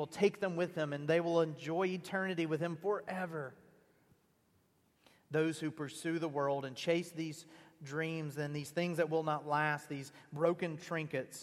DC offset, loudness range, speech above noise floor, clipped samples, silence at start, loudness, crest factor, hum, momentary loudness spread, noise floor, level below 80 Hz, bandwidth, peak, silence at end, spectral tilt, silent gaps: under 0.1%; 5 LU; 37 dB; under 0.1%; 0 s; -37 LUFS; 20 dB; none; 9 LU; -73 dBFS; -82 dBFS; 15 kHz; -16 dBFS; 0 s; -6 dB/octave; none